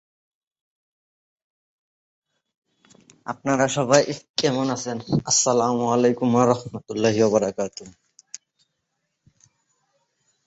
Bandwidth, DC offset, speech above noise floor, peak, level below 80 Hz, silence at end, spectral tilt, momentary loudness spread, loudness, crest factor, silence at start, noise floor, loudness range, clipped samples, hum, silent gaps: 8.2 kHz; under 0.1%; 56 dB; -2 dBFS; -62 dBFS; 2.55 s; -4 dB/octave; 20 LU; -21 LUFS; 22 dB; 3.25 s; -77 dBFS; 8 LU; under 0.1%; none; 4.30-4.34 s